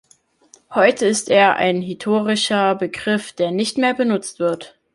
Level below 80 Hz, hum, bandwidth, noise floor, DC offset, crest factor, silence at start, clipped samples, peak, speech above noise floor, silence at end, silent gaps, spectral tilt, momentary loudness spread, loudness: -62 dBFS; none; 11.5 kHz; -53 dBFS; under 0.1%; 16 dB; 0.7 s; under 0.1%; -2 dBFS; 35 dB; 0.25 s; none; -4 dB/octave; 8 LU; -18 LUFS